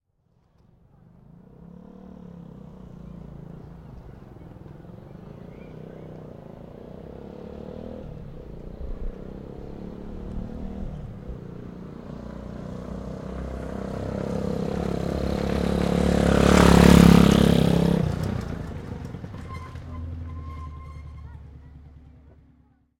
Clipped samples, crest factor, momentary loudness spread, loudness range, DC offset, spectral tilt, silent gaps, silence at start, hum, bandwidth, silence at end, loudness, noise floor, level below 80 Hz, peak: under 0.1%; 26 dB; 26 LU; 25 LU; under 0.1%; -6.5 dB/octave; none; 1.6 s; none; 16 kHz; 0.9 s; -22 LUFS; -66 dBFS; -36 dBFS; 0 dBFS